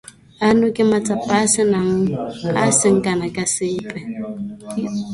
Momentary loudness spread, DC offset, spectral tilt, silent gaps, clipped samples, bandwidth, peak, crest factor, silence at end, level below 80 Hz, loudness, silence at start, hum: 13 LU; under 0.1%; -4.5 dB/octave; none; under 0.1%; 11.5 kHz; -2 dBFS; 18 dB; 0 s; -52 dBFS; -18 LUFS; 0.4 s; none